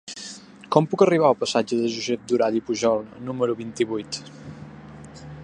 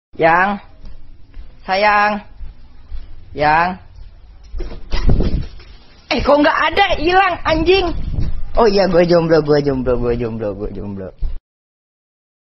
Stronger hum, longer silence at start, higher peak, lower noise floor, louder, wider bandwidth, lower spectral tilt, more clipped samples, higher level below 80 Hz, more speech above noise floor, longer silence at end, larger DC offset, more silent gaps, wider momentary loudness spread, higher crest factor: neither; about the same, 0.05 s vs 0.15 s; about the same, -2 dBFS vs 0 dBFS; about the same, -42 dBFS vs -39 dBFS; second, -23 LUFS vs -15 LUFS; first, 10.5 kHz vs 6.2 kHz; second, -5 dB/octave vs -7 dB/octave; neither; second, -60 dBFS vs -26 dBFS; second, 20 dB vs 25 dB; second, 0 s vs 1.2 s; neither; neither; first, 23 LU vs 19 LU; first, 22 dB vs 16 dB